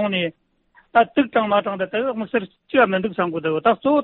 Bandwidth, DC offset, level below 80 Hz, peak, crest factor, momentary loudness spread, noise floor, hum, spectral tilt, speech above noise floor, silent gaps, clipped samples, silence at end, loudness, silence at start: 4.3 kHz; under 0.1%; -60 dBFS; -4 dBFS; 16 dB; 7 LU; -58 dBFS; none; -3.5 dB/octave; 38 dB; none; under 0.1%; 0 s; -20 LUFS; 0 s